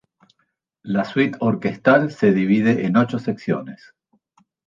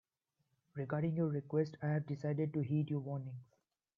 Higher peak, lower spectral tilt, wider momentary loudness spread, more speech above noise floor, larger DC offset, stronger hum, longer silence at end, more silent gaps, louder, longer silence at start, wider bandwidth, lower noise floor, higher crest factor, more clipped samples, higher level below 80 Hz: first, -2 dBFS vs -22 dBFS; second, -8 dB/octave vs -9.5 dB/octave; about the same, 9 LU vs 11 LU; first, 52 dB vs 48 dB; neither; neither; first, 0.9 s vs 0.55 s; neither; first, -19 LUFS vs -38 LUFS; about the same, 0.85 s vs 0.75 s; first, 7.4 kHz vs 6 kHz; second, -71 dBFS vs -85 dBFS; about the same, 18 dB vs 16 dB; neither; first, -62 dBFS vs -80 dBFS